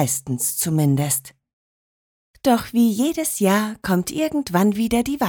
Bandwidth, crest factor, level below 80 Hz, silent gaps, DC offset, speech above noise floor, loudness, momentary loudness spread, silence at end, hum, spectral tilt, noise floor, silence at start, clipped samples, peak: over 20 kHz; 16 dB; -50 dBFS; 1.53-2.34 s; under 0.1%; over 70 dB; -20 LUFS; 4 LU; 0 s; none; -5 dB/octave; under -90 dBFS; 0 s; under 0.1%; -4 dBFS